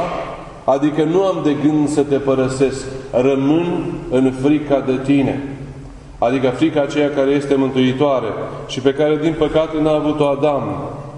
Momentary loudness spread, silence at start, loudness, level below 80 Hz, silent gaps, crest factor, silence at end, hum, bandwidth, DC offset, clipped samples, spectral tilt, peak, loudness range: 9 LU; 0 s; -17 LUFS; -42 dBFS; none; 16 dB; 0 s; none; 10.5 kHz; under 0.1%; under 0.1%; -6.5 dB/octave; 0 dBFS; 1 LU